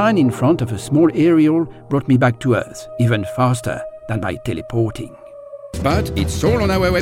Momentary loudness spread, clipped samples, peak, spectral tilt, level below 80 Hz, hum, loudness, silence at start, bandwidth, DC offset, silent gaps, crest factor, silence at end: 15 LU; under 0.1%; -4 dBFS; -7 dB/octave; -34 dBFS; none; -18 LUFS; 0 s; 16 kHz; under 0.1%; none; 14 dB; 0 s